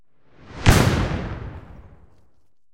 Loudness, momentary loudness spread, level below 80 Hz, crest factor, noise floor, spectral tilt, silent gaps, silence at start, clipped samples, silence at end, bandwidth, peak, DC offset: -20 LUFS; 24 LU; -32 dBFS; 22 dB; -66 dBFS; -5 dB/octave; none; 0.45 s; under 0.1%; 0.85 s; 16.5 kHz; -2 dBFS; under 0.1%